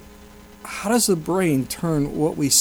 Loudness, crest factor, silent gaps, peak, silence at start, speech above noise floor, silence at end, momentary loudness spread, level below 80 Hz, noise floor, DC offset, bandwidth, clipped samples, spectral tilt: -21 LUFS; 18 dB; none; -4 dBFS; 0 s; 24 dB; 0 s; 11 LU; -48 dBFS; -44 dBFS; under 0.1%; over 20 kHz; under 0.1%; -4 dB/octave